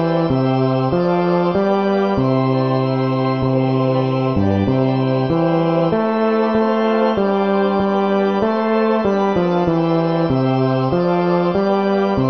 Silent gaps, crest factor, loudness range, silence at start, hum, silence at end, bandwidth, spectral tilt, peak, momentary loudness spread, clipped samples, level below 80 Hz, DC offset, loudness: none; 12 dB; 1 LU; 0 s; none; 0 s; 6.2 kHz; -9 dB/octave; -4 dBFS; 1 LU; under 0.1%; -44 dBFS; 0.3%; -17 LUFS